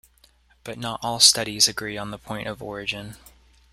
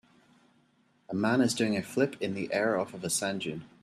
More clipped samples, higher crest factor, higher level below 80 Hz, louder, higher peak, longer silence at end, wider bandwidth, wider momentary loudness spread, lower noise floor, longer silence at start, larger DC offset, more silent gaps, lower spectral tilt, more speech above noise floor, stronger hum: neither; first, 26 dB vs 18 dB; first, -54 dBFS vs -70 dBFS; first, -21 LUFS vs -30 LUFS; first, 0 dBFS vs -12 dBFS; first, 0.55 s vs 0.15 s; first, 16 kHz vs 14.5 kHz; first, 20 LU vs 9 LU; second, -59 dBFS vs -68 dBFS; second, 0.65 s vs 1.1 s; neither; neither; second, -1 dB/octave vs -4.5 dB/octave; second, 34 dB vs 38 dB; neither